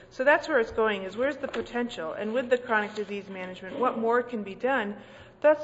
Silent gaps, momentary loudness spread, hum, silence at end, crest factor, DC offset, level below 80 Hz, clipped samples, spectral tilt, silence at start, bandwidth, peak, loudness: none; 12 LU; none; 0 s; 20 dB; under 0.1%; -60 dBFS; under 0.1%; -5 dB/octave; 0 s; 8 kHz; -8 dBFS; -28 LUFS